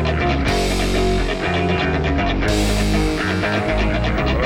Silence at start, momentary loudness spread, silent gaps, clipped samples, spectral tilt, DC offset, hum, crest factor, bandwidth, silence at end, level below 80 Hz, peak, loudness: 0 s; 1 LU; none; under 0.1%; -5.5 dB/octave; under 0.1%; none; 14 dB; 16.5 kHz; 0 s; -24 dBFS; -4 dBFS; -19 LUFS